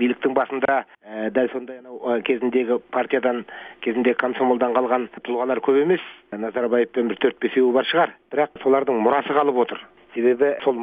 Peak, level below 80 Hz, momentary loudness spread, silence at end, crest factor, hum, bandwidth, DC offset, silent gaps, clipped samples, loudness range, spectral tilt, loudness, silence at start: -4 dBFS; -70 dBFS; 10 LU; 0 s; 18 dB; none; 4.8 kHz; under 0.1%; none; under 0.1%; 3 LU; -7.5 dB/octave; -21 LUFS; 0 s